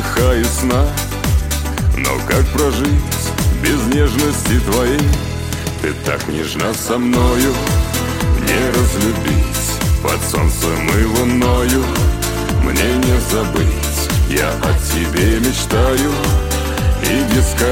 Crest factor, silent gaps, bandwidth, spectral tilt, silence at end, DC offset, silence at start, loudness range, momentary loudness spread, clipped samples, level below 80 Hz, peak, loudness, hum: 12 dB; none; 17 kHz; -5 dB/octave; 0 s; under 0.1%; 0 s; 2 LU; 4 LU; under 0.1%; -20 dBFS; -2 dBFS; -16 LUFS; none